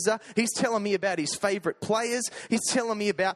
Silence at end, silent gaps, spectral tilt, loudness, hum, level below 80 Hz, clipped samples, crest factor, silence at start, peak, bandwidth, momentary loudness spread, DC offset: 0 s; none; -3 dB/octave; -27 LUFS; none; -70 dBFS; under 0.1%; 16 dB; 0 s; -10 dBFS; 14 kHz; 3 LU; under 0.1%